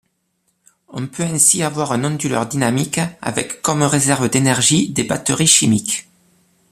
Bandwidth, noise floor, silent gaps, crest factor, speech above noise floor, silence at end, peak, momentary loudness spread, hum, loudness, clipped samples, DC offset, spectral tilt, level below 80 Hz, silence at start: 15 kHz; -67 dBFS; none; 18 dB; 50 dB; 0.7 s; 0 dBFS; 11 LU; none; -16 LUFS; under 0.1%; under 0.1%; -3.5 dB/octave; -52 dBFS; 0.9 s